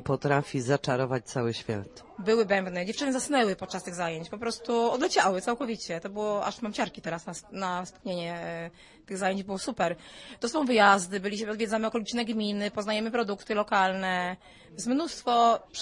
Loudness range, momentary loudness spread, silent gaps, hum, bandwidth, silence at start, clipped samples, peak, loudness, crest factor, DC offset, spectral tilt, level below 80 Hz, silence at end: 6 LU; 11 LU; none; none; 11.5 kHz; 0 s; under 0.1%; -8 dBFS; -29 LUFS; 22 dB; under 0.1%; -4.5 dB/octave; -62 dBFS; 0 s